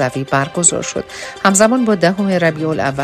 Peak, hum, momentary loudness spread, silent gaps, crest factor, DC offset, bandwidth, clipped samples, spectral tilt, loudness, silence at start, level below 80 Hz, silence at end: 0 dBFS; none; 10 LU; none; 14 dB; under 0.1%; 14 kHz; under 0.1%; -4 dB/octave; -14 LUFS; 0 s; -50 dBFS; 0 s